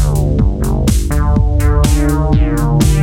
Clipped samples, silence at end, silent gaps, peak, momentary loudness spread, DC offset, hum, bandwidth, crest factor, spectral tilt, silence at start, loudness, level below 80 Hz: under 0.1%; 0 s; none; 0 dBFS; 2 LU; under 0.1%; none; 16.5 kHz; 12 dB; -6.5 dB/octave; 0 s; -13 LUFS; -14 dBFS